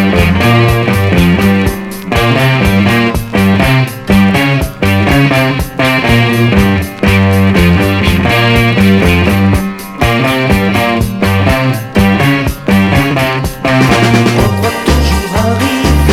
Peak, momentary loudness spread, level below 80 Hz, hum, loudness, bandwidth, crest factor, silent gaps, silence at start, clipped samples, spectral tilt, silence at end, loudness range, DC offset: 0 dBFS; 4 LU; -22 dBFS; none; -10 LUFS; 16.5 kHz; 8 dB; none; 0 s; 0.4%; -6 dB/octave; 0 s; 2 LU; under 0.1%